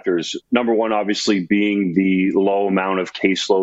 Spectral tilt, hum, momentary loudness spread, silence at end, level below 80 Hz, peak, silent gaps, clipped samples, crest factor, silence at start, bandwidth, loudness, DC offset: -5 dB/octave; none; 4 LU; 0 s; -62 dBFS; 0 dBFS; none; under 0.1%; 18 dB; 0.05 s; 8.2 kHz; -18 LUFS; under 0.1%